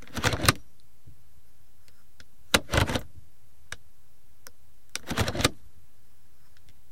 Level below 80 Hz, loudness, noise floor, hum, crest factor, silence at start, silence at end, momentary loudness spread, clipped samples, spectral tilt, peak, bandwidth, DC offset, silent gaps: -46 dBFS; -27 LUFS; -62 dBFS; none; 30 dB; 0.15 s; 1.4 s; 21 LU; under 0.1%; -3.5 dB/octave; -2 dBFS; 16.5 kHz; 2%; none